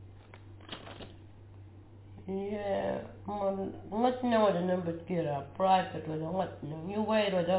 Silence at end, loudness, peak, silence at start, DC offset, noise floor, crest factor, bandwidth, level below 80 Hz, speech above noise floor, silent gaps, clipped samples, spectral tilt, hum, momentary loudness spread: 0 s; -32 LUFS; -14 dBFS; 0 s; under 0.1%; -52 dBFS; 18 dB; 4 kHz; -60 dBFS; 20 dB; none; under 0.1%; -5 dB/octave; none; 25 LU